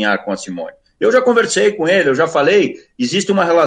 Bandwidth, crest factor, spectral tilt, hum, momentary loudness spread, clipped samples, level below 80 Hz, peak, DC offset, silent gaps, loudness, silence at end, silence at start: 9.8 kHz; 12 dB; -4 dB/octave; none; 11 LU; under 0.1%; -60 dBFS; -2 dBFS; under 0.1%; none; -14 LUFS; 0 s; 0 s